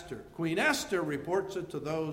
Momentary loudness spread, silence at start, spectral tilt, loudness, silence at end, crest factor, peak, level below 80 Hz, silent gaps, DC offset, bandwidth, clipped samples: 9 LU; 0 s; -4.5 dB/octave; -32 LUFS; 0 s; 18 dB; -14 dBFS; -62 dBFS; none; under 0.1%; 16 kHz; under 0.1%